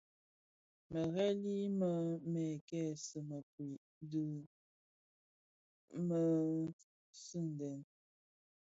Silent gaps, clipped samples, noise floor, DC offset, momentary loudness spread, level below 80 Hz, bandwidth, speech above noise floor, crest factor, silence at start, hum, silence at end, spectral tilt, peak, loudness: 2.61-2.68 s, 3.43-3.58 s, 3.77-4.01 s, 4.46-5.88 s, 6.73-7.13 s; under 0.1%; under -90 dBFS; under 0.1%; 13 LU; -80 dBFS; 7.6 kHz; over 50 dB; 16 dB; 0.9 s; none; 0.8 s; -8 dB/octave; -26 dBFS; -40 LUFS